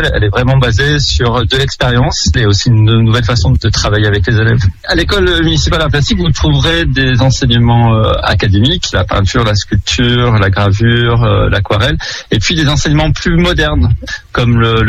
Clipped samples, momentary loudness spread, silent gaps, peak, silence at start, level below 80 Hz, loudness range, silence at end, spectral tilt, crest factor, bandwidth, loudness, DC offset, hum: under 0.1%; 4 LU; none; 0 dBFS; 0 s; -20 dBFS; 1 LU; 0 s; -5.5 dB/octave; 10 dB; 9 kHz; -10 LUFS; under 0.1%; none